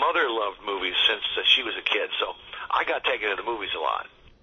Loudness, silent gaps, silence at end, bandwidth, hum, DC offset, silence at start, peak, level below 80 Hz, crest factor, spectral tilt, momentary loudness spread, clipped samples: -24 LUFS; none; 0.15 s; 6.6 kHz; none; under 0.1%; 0 s; -6 dBFS; -60 dBFS; 20 dB; -2 dB/octave; 10 LU; under 0.1%